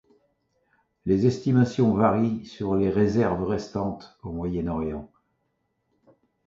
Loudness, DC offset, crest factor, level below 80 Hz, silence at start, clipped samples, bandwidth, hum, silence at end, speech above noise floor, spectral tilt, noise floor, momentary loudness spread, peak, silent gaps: -25 LUFS; under 0.1%; 20 dB; -48 dBFS; 1.05 s; under 0.1%; 7.6 kHz; none; 1.4 s; 51 dB; -8.5 dB/octave; -75 dBFS; 12 LU; -6 dBFS; none